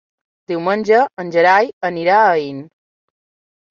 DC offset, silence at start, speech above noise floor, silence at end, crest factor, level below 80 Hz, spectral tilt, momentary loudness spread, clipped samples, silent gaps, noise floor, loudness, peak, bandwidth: under 0.1%; 0.5 s; over 75 dB; 1.1 s; 16 dB; -66 dBFS; -6 dB/octave; 12 LU; under 0.1%; 1.73-1.81 s; under -90 dBFS; -15 LUFS; -2 dBFS; 7.2 kHz